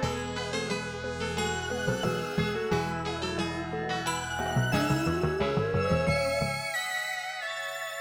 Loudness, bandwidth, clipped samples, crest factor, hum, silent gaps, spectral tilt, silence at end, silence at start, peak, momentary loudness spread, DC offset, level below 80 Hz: -30 LUFS; over 20 kHz; under 0.1%; 18 dB; none; none; -5 dB/octave; 0 s; 0 s; -12 dBFS; 6 LU; under 0.1%; -48 dBFS